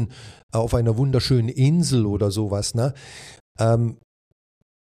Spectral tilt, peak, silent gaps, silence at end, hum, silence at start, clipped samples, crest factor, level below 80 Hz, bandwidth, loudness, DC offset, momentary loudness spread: -6.5 dB/octave; -8 dBFS; 0.43-0.49 s, 3.40-3.55 s; 0.9 s; none; 0 s; under 0.1%; 14 dB; -42 dBFS; 14 kHz; -21 LUFS; under 0.1%; 14 LU